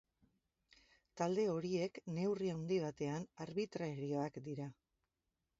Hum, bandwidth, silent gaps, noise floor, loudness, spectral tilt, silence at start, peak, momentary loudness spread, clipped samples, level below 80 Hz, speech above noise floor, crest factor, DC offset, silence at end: none; 7.6 kHz; none; -89 dBFS; -41 LUFS; -6.5 dB/octave; 1.15 s; -22 dBFS; 9 LU; under 0.1%; -76 dBFS; 49 dB; 20 dB; under 0.1%; 0.9 s